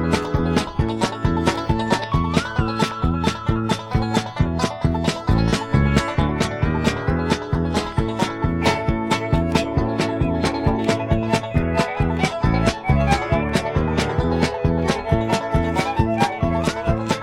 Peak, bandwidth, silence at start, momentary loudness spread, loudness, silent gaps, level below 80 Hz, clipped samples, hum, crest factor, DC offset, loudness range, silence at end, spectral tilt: -2 dBFS; 13.5 kHz; 0 s; 3 LU; -21 LUFS; none; -30 dBFS; under 0.1%; none; 18 dB; under 0.1%; 1 LU; 0 s; -6 dB/octave